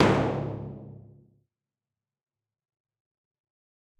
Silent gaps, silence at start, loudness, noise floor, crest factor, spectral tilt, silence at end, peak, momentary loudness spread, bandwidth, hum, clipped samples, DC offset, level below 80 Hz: none; 0 s; -29 LUFS; under -90 dBFS; 26 dB; -7 dB/octave; 3 s; -6 dBFS; 23 LU; 11.5 kHz; none; under 0.1%; under 0.1%; -52 dBFS